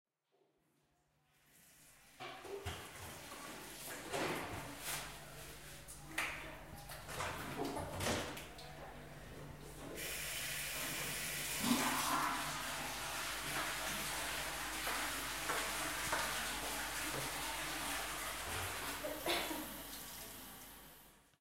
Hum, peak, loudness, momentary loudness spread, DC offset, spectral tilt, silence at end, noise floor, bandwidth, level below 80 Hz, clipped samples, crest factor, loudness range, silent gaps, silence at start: none; -20 dBFS; -41 LUFS; 14 LU; under 0.1%; -2 dB/octave; 0 s; -79 dBFS; 16 kHz; -60 dBFS; under 0.1%; 24 dB; 8 LU; none; 0.05 s